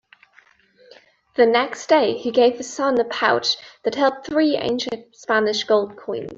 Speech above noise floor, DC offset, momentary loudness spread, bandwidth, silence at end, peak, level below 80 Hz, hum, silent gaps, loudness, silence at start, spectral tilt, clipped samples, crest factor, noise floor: 36 dB; under 0.1%; 9 LU; 7.8 kHz; 0 s; -4 dBFS; -64 dBFS; none; none; -20 LUFS; 1.4 s; -3.5 dB/octave; under 0.1%; 18 dB; -55 dBFS